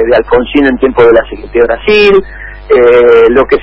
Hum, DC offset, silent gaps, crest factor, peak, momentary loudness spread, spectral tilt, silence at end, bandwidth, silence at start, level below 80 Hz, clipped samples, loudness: none; under 0.1%; none; 6 dB; 0 dBFS; 7 LU; -7 dB/octave; 0 s; 5.8 kHz; 0 s; -28 dBFS; 1%; -7 LUFS